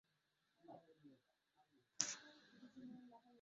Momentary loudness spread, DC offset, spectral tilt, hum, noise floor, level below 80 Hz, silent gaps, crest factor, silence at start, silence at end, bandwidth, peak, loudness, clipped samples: 22 LU; under 0.1%; -1 dB/octave; none; -86 dBFS; under -90 dBFS; none; 40 dB; 0.65 s; 0 s; 7.4 kHz; -16 dBFS; -48 LUFS; under 0.1%